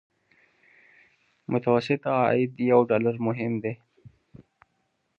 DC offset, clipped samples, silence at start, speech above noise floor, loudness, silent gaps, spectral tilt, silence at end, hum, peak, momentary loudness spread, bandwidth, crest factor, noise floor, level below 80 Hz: under 0.1%; under 0.1%; 1.5 s; 50 dB; -25 LUFS; none; -8.5 dB/octave; 0.75 s; none; -6 dBFS; 12 LU; 6.8 kHz; 20 dB; -74 dBFS; -70 dBFS